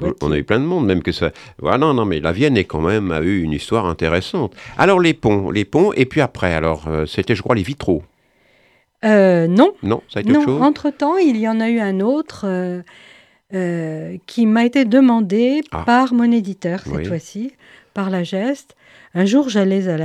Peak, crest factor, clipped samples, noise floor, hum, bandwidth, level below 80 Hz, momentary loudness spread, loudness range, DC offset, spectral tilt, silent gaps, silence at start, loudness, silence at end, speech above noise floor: 0 dBFS; 16 dB; under 0.1%; -57 dBFS; none; 11.5 kHz; -42 dBFS; 11 LU; 4 LU; under 0.1%; -7 dB/octave; none; 0 s; -17 LUFS; 0 s; 40 dB